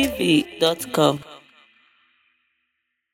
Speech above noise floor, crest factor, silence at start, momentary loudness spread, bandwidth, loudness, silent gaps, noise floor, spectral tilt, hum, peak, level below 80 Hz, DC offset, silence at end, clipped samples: 56 dB; 22 dB; 0 s; 3 LU; 16.5 kHz; -20 LUFS; none; -76 dBFS; -4.5 dB/octave; none; -2 dBFS; -54 dBFS; under 0.1%; 1.75 s; under 0.1%